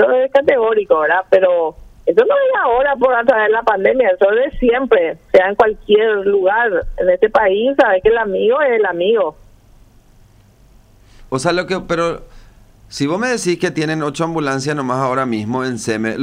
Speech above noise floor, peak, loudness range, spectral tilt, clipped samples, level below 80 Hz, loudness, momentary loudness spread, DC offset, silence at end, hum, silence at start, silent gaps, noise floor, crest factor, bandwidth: 33 dB; 0 dBFS; 8 LU; -5 dB/octave; under 0.1%; -40 dBFS; -15 LUFS; 7 LU; under 0.1%; 0 s; none; 0 s; none; -47 dBFS; 14 dB; 11.5 kHz